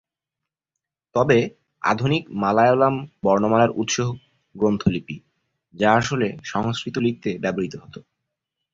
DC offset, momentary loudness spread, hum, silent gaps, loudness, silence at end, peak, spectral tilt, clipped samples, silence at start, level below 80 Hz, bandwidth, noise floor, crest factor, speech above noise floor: under 0.1%; 12 LU; none; none; -21 LUFS; 0.75 s; -4 dBFS; -5.5 dB/octave; under 0.1%; 1.15 s; -54 dBFS; 7.8 kHz; -86 dBFS; 20 dB; 65 dB